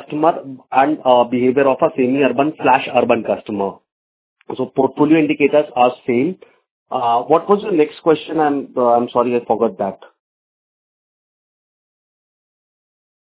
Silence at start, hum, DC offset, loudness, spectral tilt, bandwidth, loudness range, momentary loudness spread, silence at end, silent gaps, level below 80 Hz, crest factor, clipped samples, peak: 0 s; none; under 0.1%; -16 LUFS; -10 dB/octave; 4 kHz; 5 LU; 9 LU; 3.3 s; 3.92-4.36 s, 6.71-6.86 s; -62 dBFS; 18 dB; under 0.1%; 0 dBFS